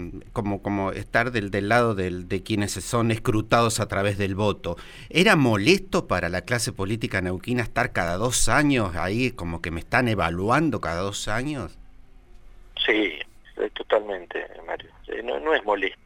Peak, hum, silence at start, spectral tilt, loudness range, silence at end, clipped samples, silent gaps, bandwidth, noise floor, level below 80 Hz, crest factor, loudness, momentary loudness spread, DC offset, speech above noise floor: -4 dBFS; none; 0 s; -4.5 dB/octave; 6 LU; 0.1 s; under 0.1%; none; 17 kHz; -46 dBFS; -40 dBFS; 20 dB; -24 LUFS; 13 LU; under 0.1%; 23 dB